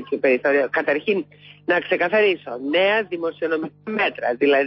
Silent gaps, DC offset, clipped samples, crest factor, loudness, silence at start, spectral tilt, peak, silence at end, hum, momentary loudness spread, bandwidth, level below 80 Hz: none; under 0.1%; under 0.1%; 14 dB; -21 LUFS; 0 s; -9 dB/octave; -8 dBFS; 0 s; 50 Hz at -55 dBFS; 9 LU; 5.8 kHz; -70 dBFS